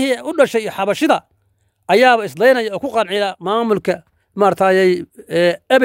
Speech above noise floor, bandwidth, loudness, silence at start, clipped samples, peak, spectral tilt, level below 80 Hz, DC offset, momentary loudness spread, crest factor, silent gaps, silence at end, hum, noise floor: 47 dB; 16 kHz; -16 LUFS; 0 s; under 0.1%; 0 dBFS; -5 dB/octave; -62 dBFS; under 0.1%; 7 LU; 16 dB; none; 0 s; none; -62 dBFS